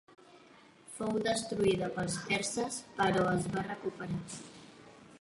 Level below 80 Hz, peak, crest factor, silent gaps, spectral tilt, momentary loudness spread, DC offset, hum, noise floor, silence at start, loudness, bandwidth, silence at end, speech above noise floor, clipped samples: -62 dBFS; -18 dBFS; 18 dB; none; -4.5 dB/octave; 16 LU; under 0.1%; none; -59 dBFS; 0.1 s; -33 LUFS; 11.5 kHz; 0.05 s; 26 dB; under 0.1%